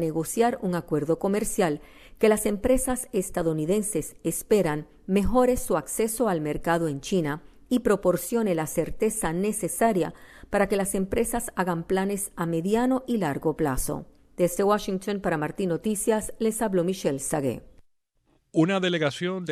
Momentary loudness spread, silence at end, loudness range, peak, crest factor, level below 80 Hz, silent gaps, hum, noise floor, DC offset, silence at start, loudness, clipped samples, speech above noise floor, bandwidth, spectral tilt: 6 LU; 0 s; 2 LU; -8 dBFS; 16 dB; -44 dBFS; none; none; -68 dBFS; under 0.1%; 0 s; -26 LUFS; under 0.1%; 42 dB; 14.5 kHz; -5 dB/octave